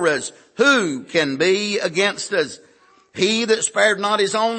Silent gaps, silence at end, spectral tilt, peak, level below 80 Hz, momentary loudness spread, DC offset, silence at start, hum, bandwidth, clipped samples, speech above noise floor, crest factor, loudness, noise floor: none; 0 s; -2.5 dB/octave; -4 dBFS; -72 dBFS; 7 LU; under 0.1%; 0 s; none; 8.8 kHz; under 0.1%; 32 dB; 16 dB; -19 LUFS; -52 dBFS